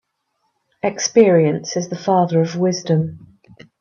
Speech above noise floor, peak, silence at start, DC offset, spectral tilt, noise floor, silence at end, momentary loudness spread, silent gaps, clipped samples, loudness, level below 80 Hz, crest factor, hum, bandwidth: 54 dB; 0 dBFS; 0.85 s; under 0.1%; -5.5 dB/octave; -70 dBFS; 0.65 s; 11 LU; none; under 0.1%; -17 LUFS; -64 dBFS; 18 dB; none; 7.4 kHz